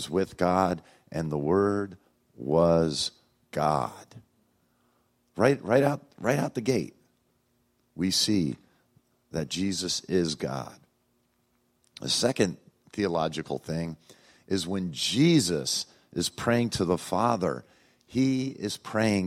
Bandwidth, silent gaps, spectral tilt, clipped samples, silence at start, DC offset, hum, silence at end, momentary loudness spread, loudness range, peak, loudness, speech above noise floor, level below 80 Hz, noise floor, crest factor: 16 kHz; none; -5 dB/octave; under 0.1%; 0 s; under 0.1%; none; 0 s; 13 LU; 4 LU; -6 dBFS; -27 LUFS; 44 dB; -60 dBFS; -71 dBFS; 22 dB